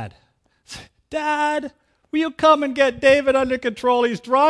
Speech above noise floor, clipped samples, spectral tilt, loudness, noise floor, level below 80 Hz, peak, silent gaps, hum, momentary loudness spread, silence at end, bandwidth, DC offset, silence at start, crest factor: 44 dB; under 0.1%; -4.5 dB/octave; -19 LUFS; -62 dBFS; -52 dBFS; -2 dBFS; none; none; 21 LU; 0 s; 11 kHz; under 0.1%; 0 s; 18 dB